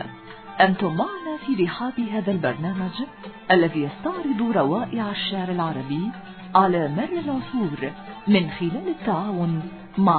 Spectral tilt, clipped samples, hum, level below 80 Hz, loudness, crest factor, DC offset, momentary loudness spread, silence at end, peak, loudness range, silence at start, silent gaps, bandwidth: -10.5 dB/octave; under 0.1%; none; -56 dBFS; -24 LUFS; 20 dB; under 0.1%; 12 LU; 0 s; -2 dBFS; 1 LU; 0 s; none; 4.5 kHz